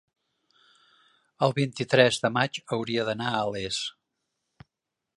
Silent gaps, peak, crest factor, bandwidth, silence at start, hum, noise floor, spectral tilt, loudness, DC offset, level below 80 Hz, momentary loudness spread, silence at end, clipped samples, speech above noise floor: none; -2 dBFS; 26 dB; 11.5 kHz; 1.4 s; none; -86 dBFS; -4.5 dB/octave; -26 LUFS; under 0.1%; -64 dBFS; 10 LU; 1.25 s; under 0.1%; 60 dB